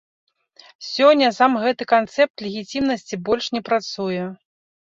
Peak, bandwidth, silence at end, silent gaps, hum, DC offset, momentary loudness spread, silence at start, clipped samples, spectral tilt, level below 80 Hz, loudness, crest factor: -2 dBFS; 7.8 kHz; 0.6 s; 2.30-2.34 s; none; under 0.1%; 13 LU; 0.8 s; under 0.1%; -4.5 dB/octave; -60 dBFS; -20 LUFS; 18 dB